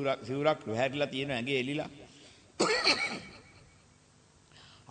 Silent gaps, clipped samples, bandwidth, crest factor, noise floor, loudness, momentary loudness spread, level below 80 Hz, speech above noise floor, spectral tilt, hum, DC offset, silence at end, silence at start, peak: none; under 0.1%; 9.4 kHz; 20 dB; -62 dBFS; -31 LUFS; 17 LU; -68 dBFS; 31 dB; -3.5 dB/octave; none; under 0.1%; 0.25 s; 0 s; -12 dBFS